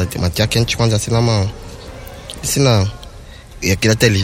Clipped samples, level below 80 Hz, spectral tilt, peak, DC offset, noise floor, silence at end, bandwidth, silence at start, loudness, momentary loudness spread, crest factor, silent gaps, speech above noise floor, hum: under 0.1%; -34 dBFS; -4.5 dB/octave; 0 dBFS; under 0.1%; -35 dBFS; 0 s; 16.5 kHz; 0 s; -16 LUFS; 20 LU; 16 dB; none; 21 dB; none